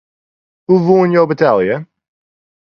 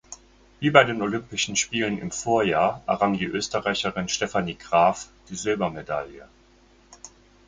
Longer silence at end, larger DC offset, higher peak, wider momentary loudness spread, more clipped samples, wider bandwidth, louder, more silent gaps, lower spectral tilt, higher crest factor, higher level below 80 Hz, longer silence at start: first, 0.9 s vs 0.4 s; neither; about the same, 0 dBFS vs 0 dBFS; about the same, 11 LU vs 12 LU; neither; second, 6.4 kHz vs 9.6 kHz; first, -13 LUFS vs -24 LUFS; neither; first, -9 dB/octave vs -3.5 dB/octave; second, 14 dB vs 24 dB; about the same, -56 dBFS vs -54 dBFS; first, 0.7 s vs 0.1 s